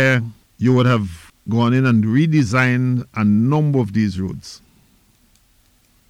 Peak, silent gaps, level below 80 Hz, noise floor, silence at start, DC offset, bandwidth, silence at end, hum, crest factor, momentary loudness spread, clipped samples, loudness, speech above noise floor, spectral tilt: -6 dBFS; none; -50 dBFS; -57 dBFS; 0 s; under 0.1%; 10.5 kHz; 1.55 s; none; 12 dB; 13 LU; under 0.1%; -17 LUFS; 40 dB; -7.5 dB/octave